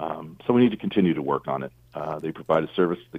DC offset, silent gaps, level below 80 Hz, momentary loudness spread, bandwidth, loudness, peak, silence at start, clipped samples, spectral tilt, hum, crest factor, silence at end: under 0.1%; none; -60 dBFS; 12 LU; 4.8 kHz; -25 LUFS; -6 dBFS; 0 s; under 0.1%; -9 dB/octave; none; 18 dB; 0 s